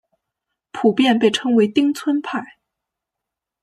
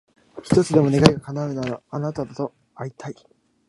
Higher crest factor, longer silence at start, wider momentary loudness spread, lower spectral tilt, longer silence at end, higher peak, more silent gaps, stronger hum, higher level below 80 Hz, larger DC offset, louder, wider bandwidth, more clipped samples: about the same, 18 dB vs 22 dB; first, 0.75 s vs 0.35 s; second, 12 LU vs 19 LU; second, -5 dB/octave vs -6.5 dB/octave; first, 1.15 s vs 0.55 s; about the same, -2 dBFS vs 0 dBFS; neither; neither; second, -68 dBFS vs -50 dBFS; neither; first, -18 LUFS vs -21 LUFS; first, 15 kHz vs 11.5 kHz; neither